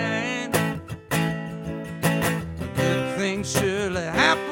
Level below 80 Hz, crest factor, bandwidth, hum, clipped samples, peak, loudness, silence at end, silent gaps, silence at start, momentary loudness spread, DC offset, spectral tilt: -48 dBFS; 20 dB; 17 kHz; none; under 0.1%; -4 dBFS; -25 LUFS; 0 s; none; 0 s; 11 LU; under 0.1%; -4.5 dB/octave